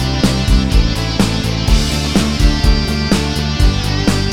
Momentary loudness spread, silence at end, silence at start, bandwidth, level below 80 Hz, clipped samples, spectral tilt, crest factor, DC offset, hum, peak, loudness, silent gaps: 2 LU; 0 s; 0 s; 16 kHz; -16 dBFS; under 0.1%; -5 dB/octave; 12 dB; 1%; none; 0 dBFS; -15 LUFS; none